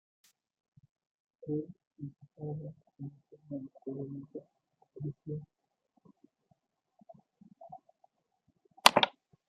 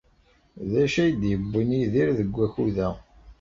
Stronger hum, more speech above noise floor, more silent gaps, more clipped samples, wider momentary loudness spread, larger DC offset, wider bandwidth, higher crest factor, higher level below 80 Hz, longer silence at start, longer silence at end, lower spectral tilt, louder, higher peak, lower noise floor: neither; about the same, 35 dB vs 37 dB; first, 1.87-1.91 s vs none; neither; first, 25 LU vs 7 LU; neither; first, 15 kHz vs 7.8 kHz; first, 36 dB vs 14 dB; second, -78 dBFS vs -46 dBFS; first, 1.4 s vs 0.55 s; first, 0.4 s vs 0.1 s; second, -3 dB/octave vs -7.5 dB/octave; second, -33 LUFS vs -24 LUFS; first, -2 dBFS vs -10 dBFS; first, -77 dBFS vs -61 dBFS